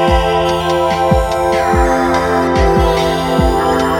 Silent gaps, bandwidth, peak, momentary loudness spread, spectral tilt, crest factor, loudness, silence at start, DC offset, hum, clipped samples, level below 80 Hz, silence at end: none; 19 kHz; 0 dBFS; 2 LU; -5.5 dB/octave; 12 dB; -13 LUFS; 0 s; under 0.1%; none; under 0.1%; -22 dBFS; 0 s